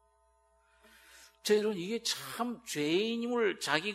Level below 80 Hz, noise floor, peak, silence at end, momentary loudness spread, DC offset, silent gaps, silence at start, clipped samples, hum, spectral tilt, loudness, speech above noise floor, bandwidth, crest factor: -76 dBFS; -70 dBFS; -10 dBFS; 0 s; 7 LU; under 0.1%; none; 1.15 s; under 0.1%; none; -3 dB/octave; -32 LUFS; 38 dB; 16 kHz; 24 dB